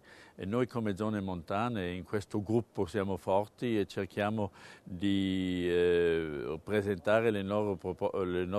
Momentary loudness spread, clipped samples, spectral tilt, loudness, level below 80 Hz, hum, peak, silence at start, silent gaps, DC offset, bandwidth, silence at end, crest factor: 9 LU; under 0.1%; -7 dB/octave; -33 LUFS; -62 dBFS; none; -12 dBFS; 0.05 s; none; under 0.1%; 13 kHz; 0 s; 20 dB